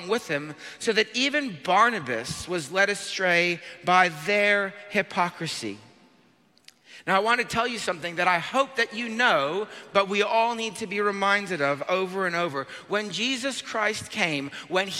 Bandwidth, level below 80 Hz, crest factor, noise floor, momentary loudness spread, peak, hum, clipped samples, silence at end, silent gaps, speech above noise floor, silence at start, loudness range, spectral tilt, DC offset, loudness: 16 kHz; -64 dBFS; 20 dB; -61 dBFS; 10 LU; -6 dBFS; none; under 0.1%; 0 s; none; 35 dB; 0 s; 4 LU; -3 dB/octave; under 0.1%; -25 LUFS